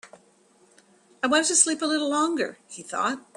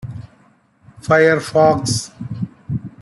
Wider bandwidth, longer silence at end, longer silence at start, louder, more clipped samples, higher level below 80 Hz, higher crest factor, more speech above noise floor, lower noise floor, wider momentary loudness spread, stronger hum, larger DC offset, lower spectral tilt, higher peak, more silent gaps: about the same, 12.5 kHz vs 12 kHz; first, 0.2 s vs 0 s; about the same, 0.05 s vs 0.05 s; second, -23 LUFS vs -17 LUFS; neither; second, -74 dBFS vs -50 dBFS; first, 22 dB vs 16 dB; second, 35 dB vs 39 dB; first, -60 dBFS vs -54 dBFS; second, 12 LU vs 19 LU; neither; neither; second, -0.5 dB/octave vs -5 dB/octave; about the same, -4 dBFS vs -2 dBFS; neither